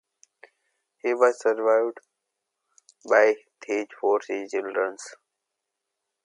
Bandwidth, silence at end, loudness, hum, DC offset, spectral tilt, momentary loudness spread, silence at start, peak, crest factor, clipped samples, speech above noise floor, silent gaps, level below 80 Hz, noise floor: 11 kHz; 1.1 s; -24 LUFS; none; under 0.1%; -3 dB/octave; 12 LU; 1.05 s; -6 dBFS; 22 dB; under 0.1%; 60 dB; none; -86 dBFS; -83 dBFS